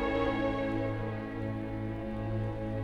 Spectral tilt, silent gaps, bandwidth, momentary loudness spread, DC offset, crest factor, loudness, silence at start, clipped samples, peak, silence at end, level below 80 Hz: -8.5 dB/octave; none; 6.4 kHz; 6 LU; under 0.1%; 16 dB; -34 LUFS; 0 s; under 0.1%; -16 dBFS; 0 s; -46 dBFS